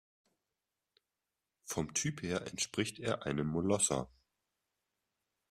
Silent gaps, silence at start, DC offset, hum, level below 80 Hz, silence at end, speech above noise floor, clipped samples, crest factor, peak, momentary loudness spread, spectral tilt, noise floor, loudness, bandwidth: none; 1.65 s; under 0.1%; none; -66 dBFS; 1.45 s; 54 dB; under 0.1%; 22 dB; -18 dBFS; 9 LU; -4 dB/octave; -90 dBFS; -35 LUFS; 14 kHz